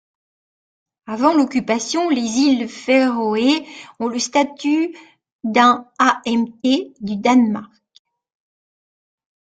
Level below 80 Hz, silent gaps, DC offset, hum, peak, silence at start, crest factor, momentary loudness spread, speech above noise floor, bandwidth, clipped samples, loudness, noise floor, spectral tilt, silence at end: -64 dBFS; 5.32-5.39 s; under 0.1%; none; 0 dBFS; 1.1 s; 18 dB; 10 LU; over 72 dB; 9.2 kHz; under 0.1%; -18 LUFS; under -90 dBFS; -3.5 dB/octave; 1.75 s